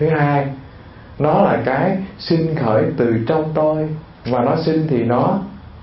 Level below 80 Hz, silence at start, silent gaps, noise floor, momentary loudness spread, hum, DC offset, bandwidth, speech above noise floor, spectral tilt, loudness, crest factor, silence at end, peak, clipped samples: -46 dBFS; 0 s; none; -38 dBFS; 9 LU; none; under 0.1%; 5.8 kHz; 22 dB; -12 dB/octave; -18 LUFS; 16 dB; 0 s; 0 dBFS; under 0.1%